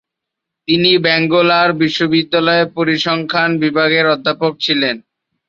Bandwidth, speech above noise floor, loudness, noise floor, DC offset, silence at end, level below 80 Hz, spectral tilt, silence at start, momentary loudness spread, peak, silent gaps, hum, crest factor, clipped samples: 7.4 kHz; 66 dB; -13 LUFS; -80 dBFS; under 0.1%; 0.5 s; -58 dBFS; -5.5 dB/octave; 0.7 s; 6 LU; 0 dBFS; none; none; 14 dB; under 0.1%